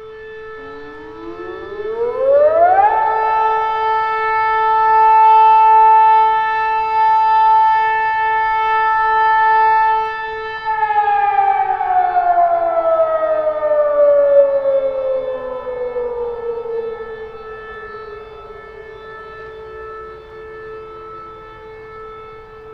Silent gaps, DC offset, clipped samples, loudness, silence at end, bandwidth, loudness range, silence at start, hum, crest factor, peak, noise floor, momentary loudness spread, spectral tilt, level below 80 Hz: none; under 0.1%; under 0.1%; -14 LUFS; 0 s; 5.6 kHz; 21 LU; 0 s; none; 14 dB; -2 dBFS; -35 dBFS; 23 LU; -5 dB/octave; -48 dBFS